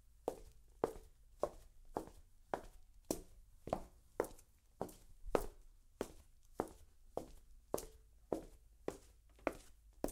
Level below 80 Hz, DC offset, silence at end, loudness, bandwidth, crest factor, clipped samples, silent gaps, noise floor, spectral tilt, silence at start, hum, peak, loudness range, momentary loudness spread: -60 dBFS; under 0.1%; 0 s; -47 LUFS; 16 kHz; 32 dB; under 0.1%; none; -64 dBFS; -5 dB/octave; 0.2 s; none; -16 dBFS; 3 LU; 21 LU